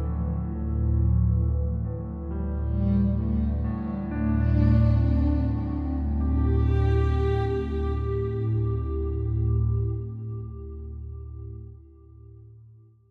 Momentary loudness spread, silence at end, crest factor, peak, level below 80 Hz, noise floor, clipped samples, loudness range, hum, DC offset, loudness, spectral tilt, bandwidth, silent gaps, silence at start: 15 LU; 0.45 s; 14 dB; -10 dBFS; -28 dBFS; -52 dBFS; under 0.1%; 7 LU; none; under 0.1%; -26 LUFS; -11 dB/octave; 4.5 kHz; none; 0 s